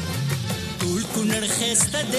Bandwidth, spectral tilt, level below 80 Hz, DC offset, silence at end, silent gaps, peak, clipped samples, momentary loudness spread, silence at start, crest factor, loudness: 14 kHz; -3 dB/octave; -48 dBFS; under 0.1%; 0 s; none; -8 dBFS; under 0.1%; 7 LU; 0 s; 16 dB; -22 LUFS